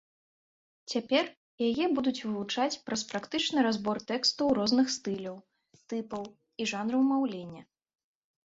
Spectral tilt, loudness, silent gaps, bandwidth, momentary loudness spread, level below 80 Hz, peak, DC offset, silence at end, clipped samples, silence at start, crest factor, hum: -3.5 dB/octave; -30 LUFS; 1.37-1.58 s; 8 kHz; 13 LU; -70 dBFS; -12 dBFS; under 0.1%; 0.85 s; under 0.1%; 0.9 s; 18 dB; none